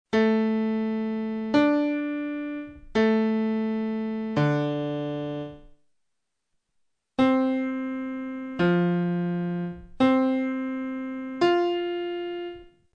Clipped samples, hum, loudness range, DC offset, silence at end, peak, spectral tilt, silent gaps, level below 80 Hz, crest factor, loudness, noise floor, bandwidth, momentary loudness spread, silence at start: under 0.1%; none; 4 LU; under 0.1%; 0.25 s; -10 dBFS; -8 dB/octave; none; -58 dBFS; 16 dB; -26 LUFS; -81 dBFS; 8 kHz; 11 LU; 0.15 s